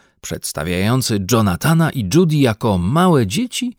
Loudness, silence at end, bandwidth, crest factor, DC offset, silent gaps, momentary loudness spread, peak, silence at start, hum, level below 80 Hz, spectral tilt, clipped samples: -16 LUFS; 0.05 s; 18.5 kHz; 14 dB; under 0.1%; none; 9 LU; -2 dBFS; 0.25 s; none; -44 dBFS; -5.5 dB/octave; under 0.1%